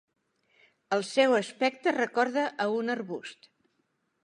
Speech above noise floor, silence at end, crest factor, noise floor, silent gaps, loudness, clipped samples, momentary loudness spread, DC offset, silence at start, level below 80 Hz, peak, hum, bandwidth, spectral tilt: 48 dB; 0.9 s; 20 dB; -76 dBFS; none; -28 LUFS; under 0.1%; 11 LU; under 0.1%; 0.9 s; -86 dBFS; -10 dBFS; none; 11.5 kHz; -4 dB/octave